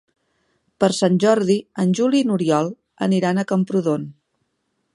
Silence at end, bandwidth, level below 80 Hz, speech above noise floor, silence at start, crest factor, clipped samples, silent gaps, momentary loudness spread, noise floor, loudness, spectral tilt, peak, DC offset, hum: 0.85 s; 11.5 kHz; -66 dBFS; 53 dB; 0.8 s; 18 dB; under 0.1%; none; 8 LU; -72 dBFS; -19 LUFS; -6 dB/octave; -2 dBFS; under 0.1%; none